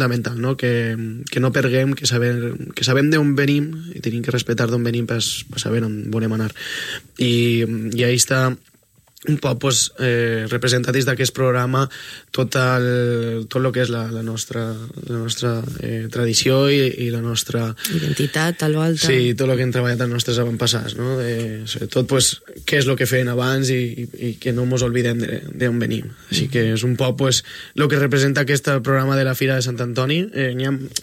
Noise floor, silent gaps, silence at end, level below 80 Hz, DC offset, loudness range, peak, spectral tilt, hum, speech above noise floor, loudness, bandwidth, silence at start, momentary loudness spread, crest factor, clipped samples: -53 dBFS; none; 0 s; -52 dBFS; under 0.1%; 3 LU; 0 dBFS; -4.5 dB/octave; none; 34 dB; -19 LUFS; 16.5 kHz; 0 s; 9 LU; 18 dB; under 0.1%